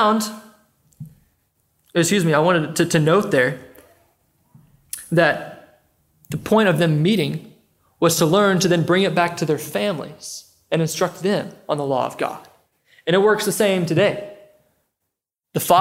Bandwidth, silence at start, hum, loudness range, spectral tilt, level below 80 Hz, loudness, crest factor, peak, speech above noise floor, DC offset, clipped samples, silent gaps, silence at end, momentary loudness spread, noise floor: 16.5 kHz; 0 s; none; 5 LU; -5 dB/octave; -62 dBFS; -19 LUFS; 20 dB; -2 dBFS; 62 dB; under 0.1%; under 0.1%; none; 0 s; 16 LU; -80 dBFS